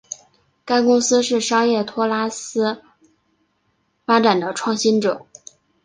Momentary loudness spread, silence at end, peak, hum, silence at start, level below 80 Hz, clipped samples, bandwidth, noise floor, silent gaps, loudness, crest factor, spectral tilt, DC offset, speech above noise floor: 15 LU; 0.65 s; -2 dBFS; none; 0.1 s; -66 dBFS; under 0.1%; 10 kHz; -67 dBFS; none; -18 LUFS; 18 dB; -3.5 dB/octave; under 0.1%; 49 dB